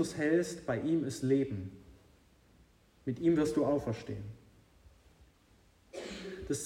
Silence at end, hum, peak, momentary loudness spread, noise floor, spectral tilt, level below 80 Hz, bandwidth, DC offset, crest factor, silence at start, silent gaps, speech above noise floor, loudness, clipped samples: 0 s; none; -18 dBFS; 15 LU; -65 dBFS; -6 dB/octave; -62 dBFS; 14.5 kHz; under 0.1%; 18 dB; 0 s; none; 33 dB; -33 LUFS; under 0.1%